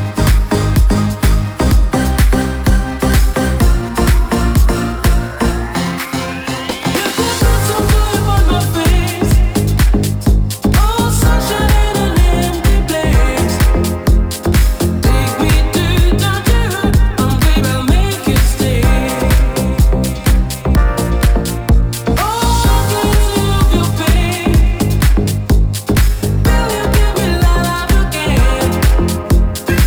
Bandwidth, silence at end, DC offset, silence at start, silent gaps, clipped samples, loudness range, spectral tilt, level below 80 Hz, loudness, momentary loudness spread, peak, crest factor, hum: over 20 kHz; 0 s; under 0.1%; 0 s; none; under 0.1%; 1 LU; -5.5 dB/octave; -14 dBFS; -14 LUFS; 2 LU; -2 dBFS; 10 dB; none